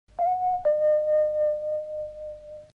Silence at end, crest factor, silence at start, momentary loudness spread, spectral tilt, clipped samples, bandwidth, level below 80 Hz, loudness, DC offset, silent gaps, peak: 0.15 s; 10 dB; 0.2 s; 16 LU; -6 dB/octave; under 0.1%; 3.2 kHz; -58 dBFS; -25 LUFS; under 0.1%; none; -16 dBFS